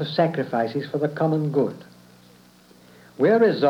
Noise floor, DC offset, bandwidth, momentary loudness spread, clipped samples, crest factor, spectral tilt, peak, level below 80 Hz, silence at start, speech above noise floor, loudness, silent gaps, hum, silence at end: -52 dBFS; under 0.1%; 12.5 kHz; 8 LU; under 0.1%; 16 dB; -8 dB/octave; -8 dBFS; -72 dBFS; 0 s; 31 dB; -23 LUFS; none; none; 0 s